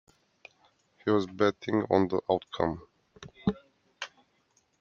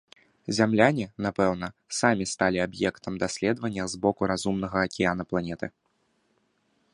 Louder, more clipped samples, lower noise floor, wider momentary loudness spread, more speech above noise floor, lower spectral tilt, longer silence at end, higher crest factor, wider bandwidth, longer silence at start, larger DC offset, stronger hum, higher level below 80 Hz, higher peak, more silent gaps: about the same, -29 LUFS vs -27 LUFS; neither; about the same, -71 dBFS vs -71 dBFS; first, 17 LU vs 9 LU; about the same, 43 dB vs 45 dB; first, -7 dB/octave vs -5 dB/octave; second, 0.75 s vs 1.25 s; about the same, 22 dB vs 24 dB; second, 7.4 kHz vs 11.5 kHz; first, 1.05 s vs 0.5 s; neither; neither; second, -62 dBFS vs -54 dBFS; second, -10 dBFS vs -4 dBFS; neither